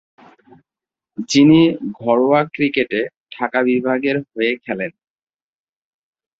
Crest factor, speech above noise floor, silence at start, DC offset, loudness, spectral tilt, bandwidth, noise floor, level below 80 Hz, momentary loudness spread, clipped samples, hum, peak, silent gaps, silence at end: 16 dB; 72 dB; 1.2 s; under 0.1%; -17 LUFS; -5.5 dB/octave; 8 kHz; -89 dBFS; -58 dBFS; 14 LU; under 0.1%; none; -2 dBFS; 3.17-3.24 s; 1.5 s